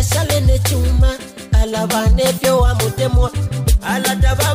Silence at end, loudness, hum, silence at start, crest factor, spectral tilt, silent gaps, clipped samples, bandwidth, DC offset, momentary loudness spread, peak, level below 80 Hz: 0 s; -16 LUFS; none; 0 s; 10 dB; -5 dB/octave; none; under 0.1%; 16 kHz; under 0.1%; 4 LU; -4 dBFS; -18 dBFS